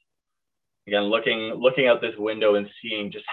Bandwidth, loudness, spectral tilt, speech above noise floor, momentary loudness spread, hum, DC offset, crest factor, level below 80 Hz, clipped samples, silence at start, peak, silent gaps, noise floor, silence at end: 4.4 kHz; -23 LUFS; -7 dB/octave; 63 dB; 9 LU; none; under 0.1%; 18 dB; -70 dBFS; under 0.1%; 0.85 s; -6 dBFS; none; -86 dBFS; 0 s